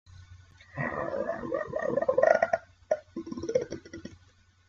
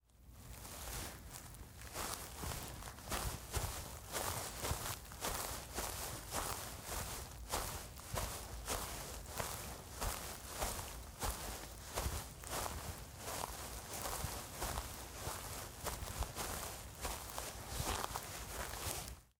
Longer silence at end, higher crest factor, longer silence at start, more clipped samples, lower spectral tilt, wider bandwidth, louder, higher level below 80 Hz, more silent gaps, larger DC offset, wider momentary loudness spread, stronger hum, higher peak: first, 0.55 s vs 0.1 s; about the same, 24 dB vs 26 dB; about the same, 0.1 s vs 0.15 s; neither; first, -6 dB/octave vs -2.5 dB/octave; second, 7.4 kHz vs 18 kHz; first, -30 LUFS vs -44 LUFS; second, -62 dBFS vs -52 dBFS; neither; neither; first, 19 LU vs 7 LU; neither; first, -8 dBFS vs -18 dBFS